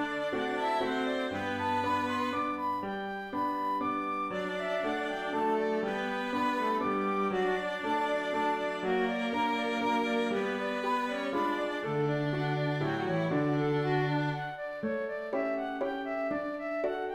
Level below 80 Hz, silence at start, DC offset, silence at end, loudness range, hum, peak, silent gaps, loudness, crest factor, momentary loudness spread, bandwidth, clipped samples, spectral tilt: -64 dBFS; 0 s; under 0.1%; 0 s; 2 LU; none; -18 dBFS; none; -31 LUFS; 12 dB; 4 LU; 15 kHz; under 0.1%; -6.5 dB/octave